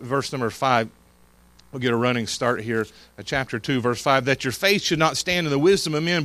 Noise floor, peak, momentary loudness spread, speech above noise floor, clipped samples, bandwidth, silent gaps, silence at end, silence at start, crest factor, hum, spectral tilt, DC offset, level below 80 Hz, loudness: -55 dBFS; -4 dBFS; 8 LU; 32 dB; under 0.1%; 15.5 kHz; none; 0 s; 0 s; 20 dB; none; -4.5 dB/octave; under 0.1%; -54 dBFS; -22 LUFS